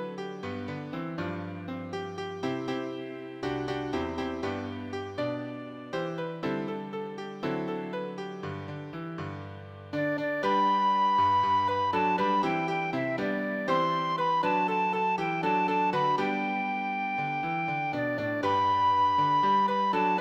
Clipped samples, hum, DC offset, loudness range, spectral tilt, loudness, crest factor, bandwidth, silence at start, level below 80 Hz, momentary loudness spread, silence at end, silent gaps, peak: under 0.1%; none; under 0.1%; 9 LU; -6.5 dB/octave; -29 LUFS; 14 dB; 8.4 kHz; 0 s; -64 dBFS; 13 LU; 0 s; none; -14 dBFS